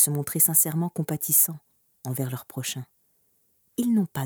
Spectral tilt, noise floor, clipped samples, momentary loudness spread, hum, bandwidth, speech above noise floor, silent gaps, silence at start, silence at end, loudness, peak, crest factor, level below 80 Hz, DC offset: -4 dB/octave; -67 dBFS; under 0.1%; 18 LU; none; over 20 kHz; 42 dB; none; 0 s; 0 s; -23 LUFS; -4 dBFS; 22 dB; -70 dBFS; under 0.1%